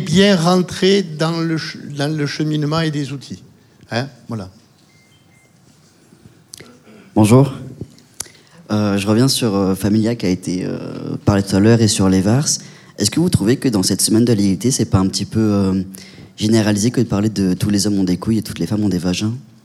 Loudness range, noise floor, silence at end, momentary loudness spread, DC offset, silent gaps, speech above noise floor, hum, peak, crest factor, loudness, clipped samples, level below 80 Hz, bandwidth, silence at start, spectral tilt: 9 LU; -51 dBFS; 0.2 s; 16 LU; under 0.1%; none; 35 dB; none; 0 dBFS; 16 dB; -16 LUFS; under 0.1%; -46 dBFS; 15.5 kHz; 0 s; -5.5 dB/octave